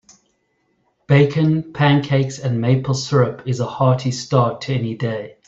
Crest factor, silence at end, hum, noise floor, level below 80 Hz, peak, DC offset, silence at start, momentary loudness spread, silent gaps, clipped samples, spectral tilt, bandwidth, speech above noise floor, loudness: 16 dB; 0.15 s; none; -66 dBFS; -54 dBFS; -2 dBFS; under 0.1%; 1.1 s; 8 LU; none; under 0.1%; -6.5 dB/octave; 7.8 kHz; 49 dB; -18 LUFS